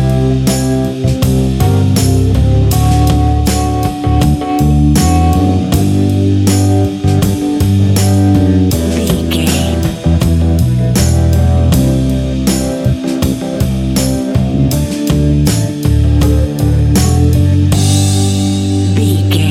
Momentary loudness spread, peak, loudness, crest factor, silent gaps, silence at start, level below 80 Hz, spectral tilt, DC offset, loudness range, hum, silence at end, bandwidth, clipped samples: 4 LU; 0 dBFS; -11 LUFS; 10 dB; none; 0 s; -18 dBFS; -6 dB/octave; under 0.1%; 2 LU; none; 0 s; 16.5 kHz; under 0.1%